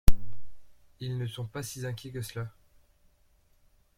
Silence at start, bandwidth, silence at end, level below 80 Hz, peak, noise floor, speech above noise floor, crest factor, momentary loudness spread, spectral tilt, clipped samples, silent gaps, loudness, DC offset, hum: 0.05 s; 16 kHz; 1.5 s; -36 dBFS; -6 dBFS; -65 dBFS; 29 dB; 22 dB; 13 LU; -5 dB/octave; under 0.1%; none; -37 LUFS; under 0.1%; none